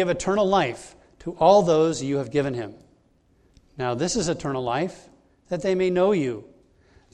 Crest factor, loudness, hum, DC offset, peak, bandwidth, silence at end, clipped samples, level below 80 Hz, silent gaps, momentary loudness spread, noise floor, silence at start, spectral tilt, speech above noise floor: 20 dB; -23 LUFS; none; under 0.1%; -4 dBFS; 11 kHz; 0.7 s; under 0.1%; -52 dBFS; none; 16 LU; -61 dBFS; 0 s; -5.5 dB/octave; 39 dB